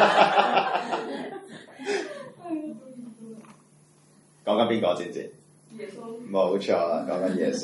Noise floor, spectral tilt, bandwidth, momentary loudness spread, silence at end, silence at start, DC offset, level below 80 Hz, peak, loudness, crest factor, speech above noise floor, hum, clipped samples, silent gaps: -58 dBFS; -4.5 dB/octave; 11.5 kHz; 21 LU; 0 s; 0 s; under 0.1%; -78 dBFS; -4 dBFS; -26 LUFS; 22 dB; 32 dB; none; under 0.1%; none